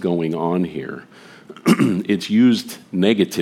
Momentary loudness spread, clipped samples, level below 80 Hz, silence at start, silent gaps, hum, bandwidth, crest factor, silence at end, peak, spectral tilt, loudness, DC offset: 13 LU; under 0.1%; -62 dBFS; 0 s; none; none; 16 kHz; 18 dB; 0 s; -2 dBFS; -6 dB/octave; -19 LUFS; under 0.1%